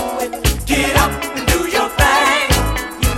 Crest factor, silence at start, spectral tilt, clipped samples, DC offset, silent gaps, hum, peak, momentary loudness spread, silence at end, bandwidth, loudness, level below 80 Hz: 16 dB; 0 s; -3.5 dB/octave; under 0.1%; under 0.1%; none; none; 0 dBFS; 7 LU; 0 s; 17 kHz; -15 LUFS; -24 dBFS